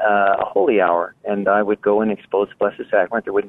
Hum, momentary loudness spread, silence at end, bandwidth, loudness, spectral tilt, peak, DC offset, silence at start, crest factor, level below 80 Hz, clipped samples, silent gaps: none; 6 LU; 0 s; 3.9 kHz; -19 LUFS; -8.5 dB/octave; -4 dBFS; under 0.1%; 0 s; 14 dB; -58 dBFS; under 0.1%; none